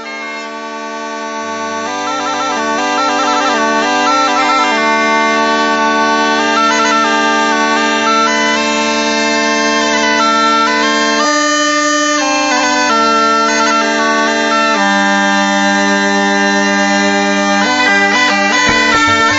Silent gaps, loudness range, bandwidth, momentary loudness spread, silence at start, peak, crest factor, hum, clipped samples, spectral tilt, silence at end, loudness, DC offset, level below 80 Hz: none; 2 LU; 8 kHz; 7 LU; 0 s; 0 dBFS; 12 dB; none; under 0.1%; -2.5 dB/octave; 0 s; -11 LUFS; under 0.1%; -52 dBFS